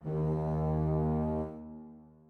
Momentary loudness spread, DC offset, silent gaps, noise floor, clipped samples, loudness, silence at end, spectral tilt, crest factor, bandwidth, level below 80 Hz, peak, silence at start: 18 LU; under 0.1%; none; -52 dBFS; under 0.1%; -32 LUFS; 0.25 s; -11.5 dB/octave; 14 dB; 2.8 kHz; -44 dBFS; -18 dBFS; 0 s